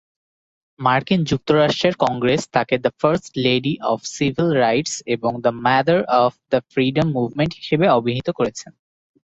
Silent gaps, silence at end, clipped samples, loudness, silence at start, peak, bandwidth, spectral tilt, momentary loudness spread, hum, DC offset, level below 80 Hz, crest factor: none; 0.7 s; under 0.1%; -19 LUFS; 0.8 s; -2 dBFS; 8.4 kHz; -5.5 dB/octave; 6 LU; none; under 0.1%; -52 dBFS; 18 dB